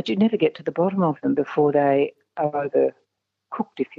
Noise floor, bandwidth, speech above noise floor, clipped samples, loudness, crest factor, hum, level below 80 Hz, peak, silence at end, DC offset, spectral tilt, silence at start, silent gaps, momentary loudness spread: -75 dBFS; 7 kHz; 54 dB; under 0.1%; -22 LUFS; 16 dB; none; -72 dBFS; -6 dBFS; 0 s; under 0.1%; -8.5 dB/octave; 0.05 s; none; 9 LU